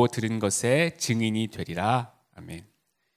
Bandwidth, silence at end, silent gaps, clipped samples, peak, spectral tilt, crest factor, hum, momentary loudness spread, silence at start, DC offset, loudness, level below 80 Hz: 16 kHz; 0.55 s; none; under 0.1%; -6 dBFS; -4.5 dB/octave; 20 dB; none; 19 LU; 0 s; under 0.1%; -26 LUFS; -56 dBFS